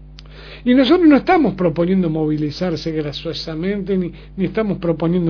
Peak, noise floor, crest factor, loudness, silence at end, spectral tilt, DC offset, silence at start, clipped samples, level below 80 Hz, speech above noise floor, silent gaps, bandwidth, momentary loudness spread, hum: -2 dBFS; -37 dBFS; 14 dB; -17 LUFS; 0 s; -8 dB/octave; under 0.1%; 0 s; under 0.1%; -40 dBFS; 21 dB; none; 5.4 kHz; 12 LU; none